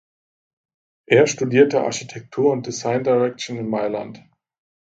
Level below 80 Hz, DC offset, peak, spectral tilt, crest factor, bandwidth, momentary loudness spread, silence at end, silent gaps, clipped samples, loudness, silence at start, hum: -64 dBFS; under 0.1%; 0 dBFS; -5 dB/octave; 20 dB; 7.8 kHz; 13 LU; 0.85 s; none; under 0.1%; -20 LUFS; 1.1 s; none